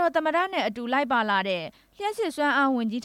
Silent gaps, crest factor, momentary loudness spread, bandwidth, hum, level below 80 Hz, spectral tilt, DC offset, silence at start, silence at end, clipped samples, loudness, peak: none; 14 dB; 9 LU; 15.5 kHz; none; -68 dBFS; -4.5 dB/octave; under 0.1%; 0 s; 0.05 s; under 0.1%; -25 LUFS; -12 dBFS